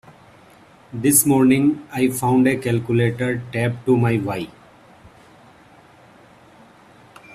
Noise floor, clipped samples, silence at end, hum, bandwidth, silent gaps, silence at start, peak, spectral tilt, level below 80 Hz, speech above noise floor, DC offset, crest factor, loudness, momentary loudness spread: -49 dBFS; under 0.1%; 0 s; none; 16 kHz; none; 0.95 s; 0 dBFS; -5.5 dB/octave; -56 dBFS; 31 dB; under 0.1%; 20 dB; -18 LUFS; 10 LU